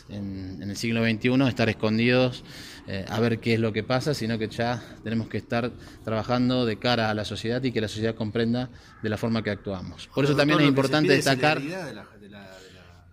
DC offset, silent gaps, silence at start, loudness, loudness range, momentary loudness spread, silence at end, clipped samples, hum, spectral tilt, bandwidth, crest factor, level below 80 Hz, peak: under 0.1%; none; 0.1 s; -25 LUFS; 4 LU; 15 LU; 0.3 s; under 0.1%; none; -6 dB/octave; 15.5 kHz; 20 dB; -54 dBFS; -6 dBFS